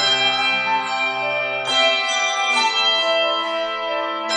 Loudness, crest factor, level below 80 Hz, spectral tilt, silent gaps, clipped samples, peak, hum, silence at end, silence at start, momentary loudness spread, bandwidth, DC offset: -18 LUFS; 14 dB; -66 dBFS; -0.5 dB/octave; none; under 0.1%; -6 dBFS; none; 0 s; 0 s; 7 LU; 10.5 kHz; under 0.1%